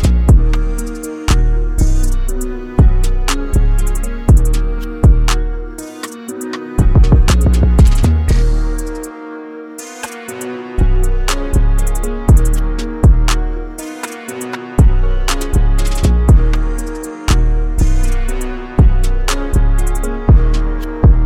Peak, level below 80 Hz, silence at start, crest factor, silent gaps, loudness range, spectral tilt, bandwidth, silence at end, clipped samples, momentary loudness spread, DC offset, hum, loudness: 0 dBFS; -12 dBFS; 0 s; 12 dB; none; 3 LU; -6 dB/octave; 15.5 kHz; 0 s; under 0.1%; 14 LU; under 0.1%; none; -15 LUFS